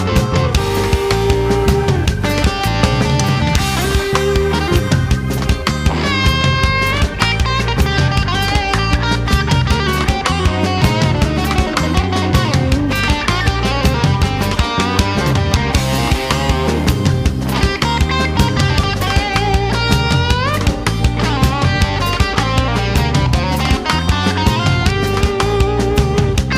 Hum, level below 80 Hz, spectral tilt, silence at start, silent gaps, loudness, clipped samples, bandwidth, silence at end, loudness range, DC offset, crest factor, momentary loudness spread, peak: none; -22 dBFS; -5 dB/octave; 0 s; none; -15 LUFS; under 0.1%; 16 kHz; 0 s; 1 LU; under 0.1%; 14 dB; 2 LU; 0 dBFS